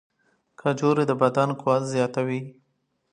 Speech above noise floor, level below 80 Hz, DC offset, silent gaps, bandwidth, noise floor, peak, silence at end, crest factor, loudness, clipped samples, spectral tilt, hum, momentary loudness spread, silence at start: 50 dB; -72 dBFS; under 0.1%; none; 10.5 kHz; -73 dBFS; -6 dBFS; 0.6 s; 20 dB; -24 LUFS; under 0.1%; -6.5 dB/octave; none; 8 LU; 0.65 s